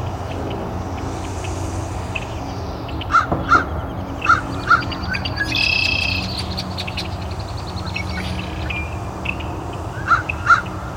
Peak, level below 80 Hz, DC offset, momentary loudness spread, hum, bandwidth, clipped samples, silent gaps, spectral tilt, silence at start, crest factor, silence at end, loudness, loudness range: 0 dBFS; -34 dBFS; under 0.1%; 12 LU; none; 16.5 kHz; under 0.1%; none; -4.5 dB/octave; 0 s; 20 dB; 0 s; -21 LUFS; 8 LU